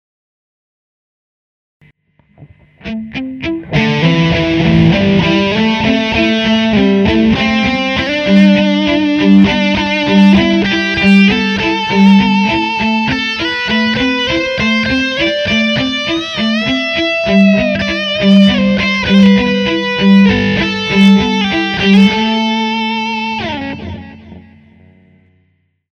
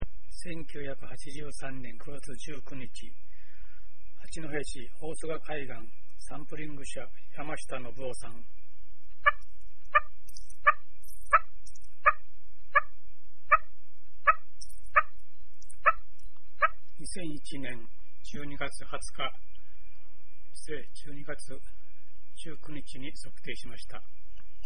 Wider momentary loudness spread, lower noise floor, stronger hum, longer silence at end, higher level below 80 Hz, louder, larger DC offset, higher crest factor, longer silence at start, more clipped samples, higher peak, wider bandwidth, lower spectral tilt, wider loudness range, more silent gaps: second, 8 LU vs 22 LU; about the same, -59 dBFS vs -60 dBFS; neither; first, 1.5 s vs 0 s; first, -36 dBFS vs -50 dBFS; first, -11 LUFS vs -32 LUFS; second, under 0.1% vs 6%; second, 12 dB vs 28 dB; first, 2.4 s vs 0 s; neither; first, 0 dBFS vs -8 dBFS; second, 7 kHz vs 11.5 kHz; first, -6 dB/octave vs -4 dB/octave; second, 7 LU vs 16 LU; neither